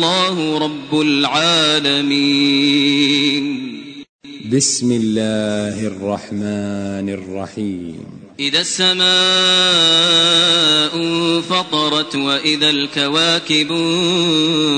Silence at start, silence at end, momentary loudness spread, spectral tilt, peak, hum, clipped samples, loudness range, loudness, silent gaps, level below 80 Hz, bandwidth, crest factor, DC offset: 0 s; 0 s; 14 LU; -3 dB/octave; -2 dBFS; none; under 0.1%; 8 LU; -14 LUFS; 4.09-4.19 s; -58 dBFS; 9.4 kHz; 14 dB; under 0.1%